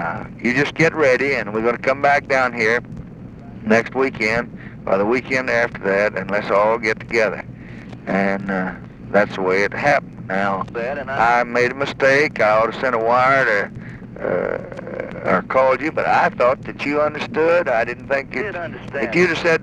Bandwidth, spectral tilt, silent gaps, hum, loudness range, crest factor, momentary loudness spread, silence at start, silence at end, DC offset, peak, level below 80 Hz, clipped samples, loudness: 11 kHz; -5.5 dB/octave; none; none; 3 LU; 16 dB; 13 LU; 0 s; 0 s; under 0.1%; -2 dBFS; -48 dBFS; under 0.1%; -18 LUFS